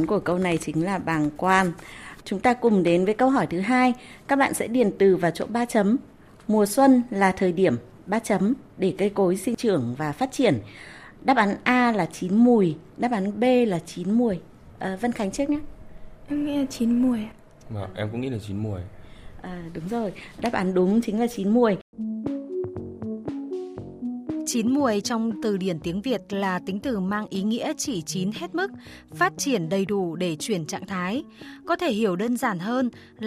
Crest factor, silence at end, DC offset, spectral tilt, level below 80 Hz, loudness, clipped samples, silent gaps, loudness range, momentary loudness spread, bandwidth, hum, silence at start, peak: 20 dB; 0 s; under 0.1%; -5.5 dB/octave; -54 dBFS; -24 LUFS; under 0.1%; 21.81-21.93 s; 6 LU; 13 LU; 15 kHz; none; 0 s; -4 dBFS